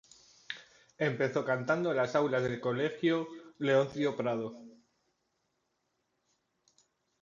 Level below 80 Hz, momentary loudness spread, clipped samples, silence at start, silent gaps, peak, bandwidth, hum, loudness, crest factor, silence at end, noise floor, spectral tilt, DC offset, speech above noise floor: -74 dBFS; 15 LU; under 0.1%; 0.5 s; none; -14 dBFS; 7.6 kHz; none; -32 LUFS; 20 dB; 2.5 s; -80 dBFS; -6.5 dB/octave; under 0.1%; 49 dB